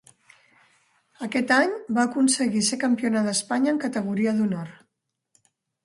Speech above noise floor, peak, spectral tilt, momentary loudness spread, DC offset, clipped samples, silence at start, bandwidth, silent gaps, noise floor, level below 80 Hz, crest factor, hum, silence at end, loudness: 56 dB; -6 dBFS; -3.5 dB/octave; 7 LU; under 0.1%; under 0.1%; 1.2 s; 11.5 kHz; none; -79 dBFS; -70 dBFS; 18 dB; none; 1.1 s; -23 LUFS